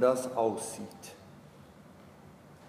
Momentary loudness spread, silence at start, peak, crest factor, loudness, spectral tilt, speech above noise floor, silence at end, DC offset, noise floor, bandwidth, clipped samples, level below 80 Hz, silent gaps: 24 LU; 0 s; -14 dBFS; 20 dB; -33 LUFS; -4.5 dB/octave; 23 dB; 0 s; under 0.1%; -54 dBFS; 15.5 kHz; under 0.1%; -70 dBFS; none